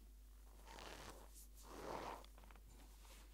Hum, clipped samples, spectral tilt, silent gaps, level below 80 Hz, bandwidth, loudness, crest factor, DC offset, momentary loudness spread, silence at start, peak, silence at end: none; under 0.1%; -3.5 dB/octave; none; -62 dBFS; 16 kHz; -57 LUFS; 22 dB; under 0.1%; 13 LU; 0 s; -34 dBFS; 0 s